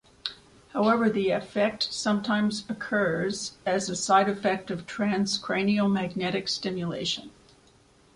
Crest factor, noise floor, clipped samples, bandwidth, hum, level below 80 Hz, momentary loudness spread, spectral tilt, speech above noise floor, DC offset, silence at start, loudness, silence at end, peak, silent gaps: 20 dB; -59 dBFS; under 0.1%; 11 kHz; none; -62 dBFS; 9 LU; -4.5 dB/octave; 32 dB; under 0.1%; 0.25 s; -27 LUFS; 0.85 s; -8 dBFS; none